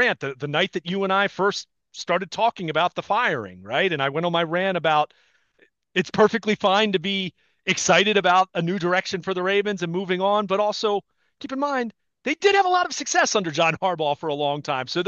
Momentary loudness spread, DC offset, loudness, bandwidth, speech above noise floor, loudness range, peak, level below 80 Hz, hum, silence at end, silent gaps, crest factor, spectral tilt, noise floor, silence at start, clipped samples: 9 LU; under 0.1%; -22 LUFS; 8.2 kHz; 40 dB; 3 LU; -4 dBFS; -68 dBFS; none; 0 s; none; 18 dB; -3.5 dB/octave; -62 dBFS; 0 s; under 0.1%